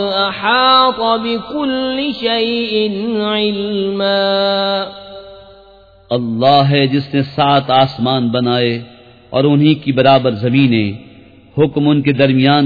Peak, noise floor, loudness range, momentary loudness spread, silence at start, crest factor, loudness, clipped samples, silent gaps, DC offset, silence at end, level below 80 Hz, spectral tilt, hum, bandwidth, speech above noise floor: 0 dBFS; -44 dBFS; 3 LU; 9 LU; 0 s; 14 dB; -14 LUFS; under 0.1%; none; under 0.1%; 0 s; -50 dBFS; -8.5 dB/octave; none; 5 kHz; 30 dB